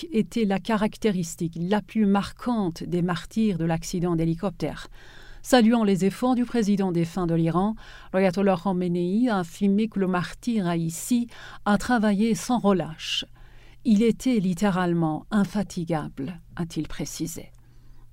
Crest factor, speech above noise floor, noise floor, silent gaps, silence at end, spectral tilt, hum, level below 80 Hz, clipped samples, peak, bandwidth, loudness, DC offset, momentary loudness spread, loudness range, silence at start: 20 dB; 22 dB; -47 dBFS; none; 0.05 s; -6 dB/octave; none; -48 dBFS; under 0.1%; -4 dBFS; 16 kHz; -25 LUFS; under 0.1%; 10 LU; 3 LU; 0 s